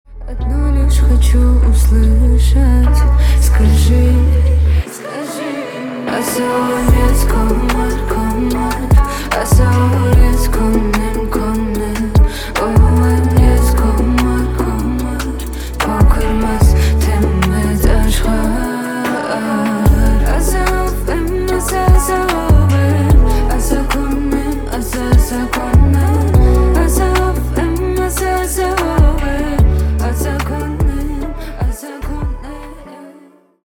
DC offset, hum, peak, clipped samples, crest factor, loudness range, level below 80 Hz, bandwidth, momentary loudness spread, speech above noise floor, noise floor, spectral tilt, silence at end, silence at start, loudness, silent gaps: under 0.1%; none; 0 dBFS; under 0.1%; 12 dB; 4 LU; -14 dBFS; 19 kHz; 10 LU; 34 dB; -44 dBFS; -6.5 dB/octave; 0.55 s; 0.1 s; -14 LUFS; none